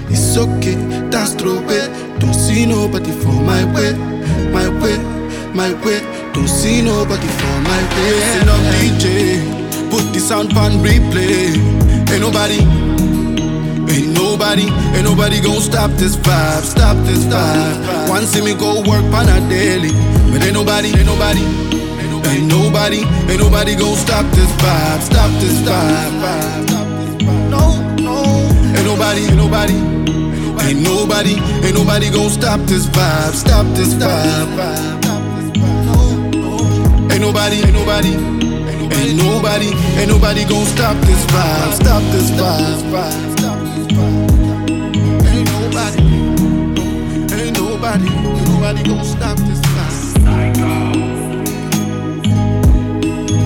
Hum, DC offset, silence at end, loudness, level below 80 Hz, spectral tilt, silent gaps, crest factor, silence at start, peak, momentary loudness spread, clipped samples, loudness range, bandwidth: none; under 0.1%; 0 s; -13 LUFS; -20 dBFS; -5 dB/octave; none; 12 dB; 0 s; -2 dBFS; 6 LU; under 0.1%; 3 LU; 18 kHz